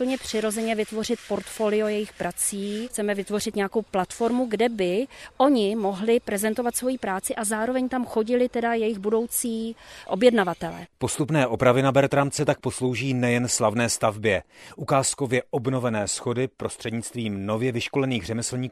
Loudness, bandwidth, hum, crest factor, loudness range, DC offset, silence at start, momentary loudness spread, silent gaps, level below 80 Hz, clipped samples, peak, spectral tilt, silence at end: -25 LUFS; 15 kHz; none; 20 dB; 4 LU; under 0.1%; 0 s; 9 LU; none; -56 dBFS; under 0.1%; -4 dBFS; -4.5 dB/octave; 0 s